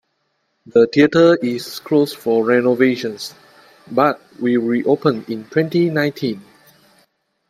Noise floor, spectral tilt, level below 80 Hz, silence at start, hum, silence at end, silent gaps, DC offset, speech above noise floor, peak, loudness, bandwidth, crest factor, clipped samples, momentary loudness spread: -69 dBFS; -6.5 dB/octave; -62 dBFS; 0.75 s; none; 1.1 s; none; under 0.1%; 52 dB; 0 dBFS; -17 LUFS; 15.5 kHz; 18 dB; under 0.1%; 12 LU